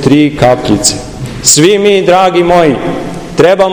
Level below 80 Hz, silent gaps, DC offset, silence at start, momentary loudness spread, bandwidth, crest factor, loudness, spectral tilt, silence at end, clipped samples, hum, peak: -34 dBFS; none; under 0.1%; 0 s; 12 LU; over 20 kHz; 8 dB; -8 LUFS; -4 dB/octave; 0 s; 5%; none; 0 dBFS